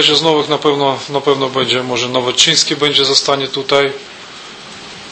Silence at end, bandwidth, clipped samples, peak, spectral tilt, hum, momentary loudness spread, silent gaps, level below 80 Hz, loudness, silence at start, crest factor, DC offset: 0 s; 11 kHz; under 0.1%; 0 dBFS; -2.5 dB/octave; none; 21 LU; none; -56 dBFS; -13 LUFS; 0 s; 14 dB; under 0.1%